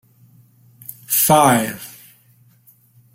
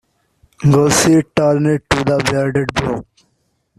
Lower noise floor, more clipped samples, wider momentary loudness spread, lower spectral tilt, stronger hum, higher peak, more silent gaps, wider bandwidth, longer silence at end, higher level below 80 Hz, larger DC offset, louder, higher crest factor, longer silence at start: second, -54 dBFS vs -64 dBFS; neither; first, 25 LU vs 8 LU; second, -3.5 dB/octave vs -5 dB/octave; neither; about the same, 0 dBFS vs 0 dBFS; neither; first, 16.5 kHz vs 14 kHz; first, 1.25 s vs 0.75 s; second, -58 dBFS vs -40 dBFS; neither; about the same, -15 LUFS vs -15 LUFS; first, 20 dB vs 14 dB; first, 0.9 s vs 0.6 s